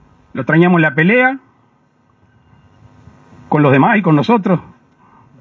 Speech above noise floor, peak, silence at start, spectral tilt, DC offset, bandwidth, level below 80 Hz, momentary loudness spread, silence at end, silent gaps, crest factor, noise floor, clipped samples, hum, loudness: 44 dB; 0 dBFS; 0.35 s; -9 dB/octave; under 0.1%; 6.6 kHz; -56 dBFS; 10 LU; 0.8 s; none; 16 dB; -55 dBFS; under 0.1%; none; -12 LUFS